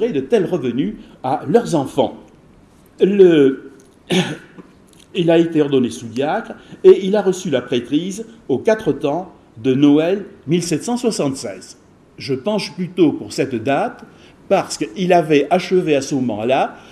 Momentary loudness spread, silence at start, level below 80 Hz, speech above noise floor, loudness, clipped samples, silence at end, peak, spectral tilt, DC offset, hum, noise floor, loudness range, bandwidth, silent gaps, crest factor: 12 LU; 0 s; -56 dBFS; 31 dB; -17 LUFS; under 0.1%; 0.1 s; 0 dBFS; -6 dB/octave; under 0.1%; none; -48 dBFS; 4 LU; 13 kHz; none; 18 dB